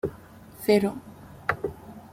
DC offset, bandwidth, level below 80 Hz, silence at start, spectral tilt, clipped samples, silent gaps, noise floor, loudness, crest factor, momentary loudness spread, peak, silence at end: under 0.1%; 16 kHz; -56 dBFS; 0.05 s; -6 dB/octave; under 0.1%; none; -47 dBFS; -27 LUFS; 22 dB; 24 LU; -8 dBFS; 0.05 s